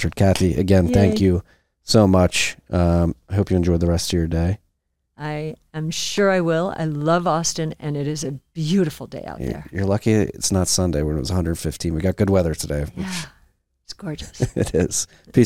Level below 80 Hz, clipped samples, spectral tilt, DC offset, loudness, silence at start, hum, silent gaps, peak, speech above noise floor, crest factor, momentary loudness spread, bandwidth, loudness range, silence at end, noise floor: -36 dBFS; under 0.1%; -5.5 dB/octave; 0.3%; -21 LUFS; 0 s; none; none; -4 dBFS; 52 dB; 16 dB; 13 LU; 16 kHz; 5 LU; 0 s; -72 dBFS